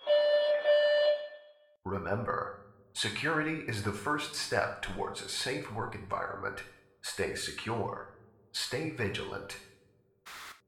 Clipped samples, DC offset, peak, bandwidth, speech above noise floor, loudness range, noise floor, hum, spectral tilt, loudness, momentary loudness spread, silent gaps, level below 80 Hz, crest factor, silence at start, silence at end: under 0.1%; under 0.1%; -14 dBFS; 15.5 kHz; 32 dB; 6 LU; -67 dBFS; none; -4 dB/octave; -33 LUFS; 19 LU; none; -60 dBFS; 20 dB; 0 s; 0.1 s